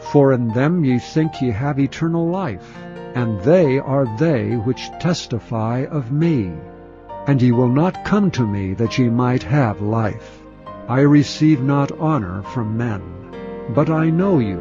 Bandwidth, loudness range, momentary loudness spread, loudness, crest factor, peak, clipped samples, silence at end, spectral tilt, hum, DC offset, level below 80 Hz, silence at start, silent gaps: 7.6 kHz; 2 LU; 15 LU; -18 LUFS; 16 dB; -2 dBFS; under 0.1%; 0 s; -8 dB/octave; none; under 0.1%; -48 dBFS; 0 s; none